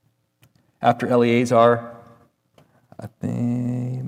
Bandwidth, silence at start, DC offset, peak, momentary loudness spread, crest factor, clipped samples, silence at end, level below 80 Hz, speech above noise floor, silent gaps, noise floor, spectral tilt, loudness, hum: 15 kHz; 0.8 s; under 0.1%; -4 dBFS; 21 LU; 18 dB; under 0.1%; 0 s; -68 dBFS; 43 dB; none; -61 dBFS; -7 dB/octave; -20 LUFS; none